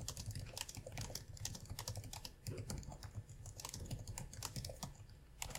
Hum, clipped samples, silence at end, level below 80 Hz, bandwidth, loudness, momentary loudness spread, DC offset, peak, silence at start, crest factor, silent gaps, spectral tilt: none; under 0.1%; 0 s; -56 dBFS; 17 kHz; -49 LUFS; 6 LU; under 0.1%; -24 dBFS; 0 s; 24 dB; none; -3.5 dB/octave